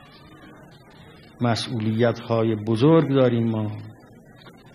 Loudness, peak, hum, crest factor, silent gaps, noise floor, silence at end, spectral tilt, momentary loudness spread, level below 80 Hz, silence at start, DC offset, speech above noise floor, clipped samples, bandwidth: -22 LUFS; -6 dBFS; none; 18 dB; none; -48 dBFS; 0.25 s; -7.5 dB/octave; 12 LU; -60 dBFS; 0.45 s; under 0.1%; 27 dB; under 0.1%; 12 kHz